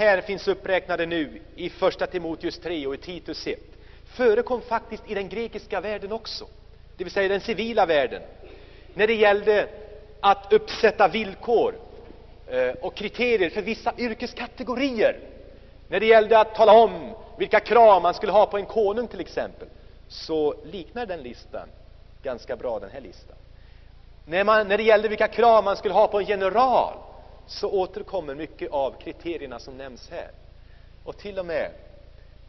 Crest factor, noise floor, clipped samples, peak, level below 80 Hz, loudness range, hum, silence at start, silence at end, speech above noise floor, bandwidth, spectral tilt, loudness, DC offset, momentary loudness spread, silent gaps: 20 dB; -47 dBFS; under 0.1%; -4 dBFS; -48 dBFS; 13 LU; none; 0 s; 0.4 s; 24 dB; 6.2 kHz; -2 dB/octave; -23 LUFS; under 0.1%; 20 LU; none